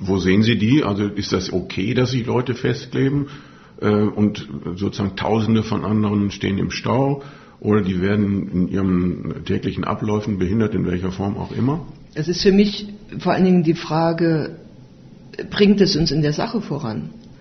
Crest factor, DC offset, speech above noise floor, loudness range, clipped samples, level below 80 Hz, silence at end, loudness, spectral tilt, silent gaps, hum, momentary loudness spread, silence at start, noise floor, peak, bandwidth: 18 dB; under 0.1%; 24 dB; 3 LU; under 0.1%; -44 dBFS; 0.05 s; -20 LUFS; -6 dB/octave; none; none; 11 LU; 0 s; -43 dBFS; -2 dBFS; 6.4 kHz